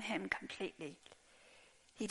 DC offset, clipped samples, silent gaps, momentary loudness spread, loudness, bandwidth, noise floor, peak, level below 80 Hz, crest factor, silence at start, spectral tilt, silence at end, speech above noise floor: under 0.1%; under 0.1%; none; 23 LU; -43 LUFS; 11.5 kHz; -66 dBFS; -20 dBFS; -74 dBFS; 26 dB; 0 s; -4 dB/octave; 0 s; 21 dB